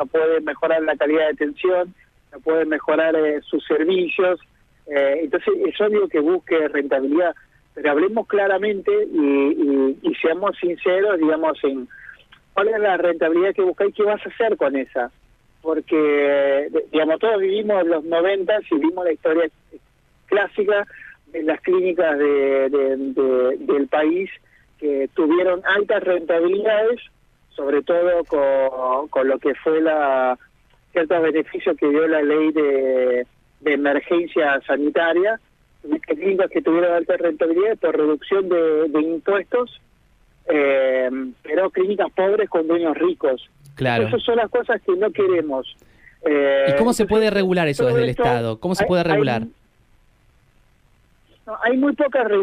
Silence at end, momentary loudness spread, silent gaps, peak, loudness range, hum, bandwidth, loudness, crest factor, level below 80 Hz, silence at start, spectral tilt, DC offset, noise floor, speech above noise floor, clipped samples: 0 s; 7 LU; none; -4 dBFS; 2 LU; none; 12.5 kHz; -19 LUFS; 14 dB; -54 dBFS; 0 s; -6.5 dB/octave; under 0.1%; -58 dBFS; 39 dB; under 0.1%